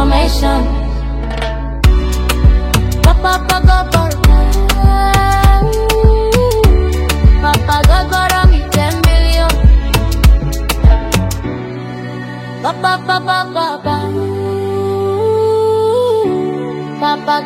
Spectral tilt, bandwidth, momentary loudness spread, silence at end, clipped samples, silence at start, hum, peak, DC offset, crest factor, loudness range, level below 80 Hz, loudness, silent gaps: -5.5 dB/octave; 16.5 kHz; 9 LU; 0 s; 0.2%; 0 s; none; 0 dBFS; under 0.1%; 10 dB; 5 LU; -14 dBFS; -13 LUFS; none